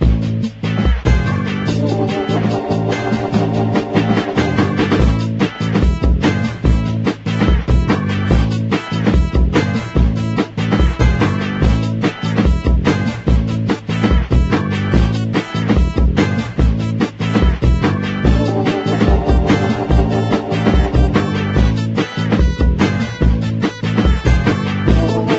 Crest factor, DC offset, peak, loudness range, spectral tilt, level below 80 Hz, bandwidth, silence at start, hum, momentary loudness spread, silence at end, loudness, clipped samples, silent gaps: 14 dB; under 0.1%; 0 dBFS; 1 LU; -7.5 dB/octave; -20 dBFS; 8 kHz; 0 s; none; 4 LU; 0 s; -16 LUFS; under 0.1%; none